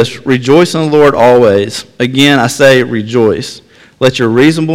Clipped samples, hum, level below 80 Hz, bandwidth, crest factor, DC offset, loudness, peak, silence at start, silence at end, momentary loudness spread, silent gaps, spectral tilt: 2%; none; -44 dBFS; 16.5 kHz; 8 dB; under 0.1%; -9 LUFS; 0 dBFS; 0 s; 0 s; 8 LU; none; -5.5 dB/octave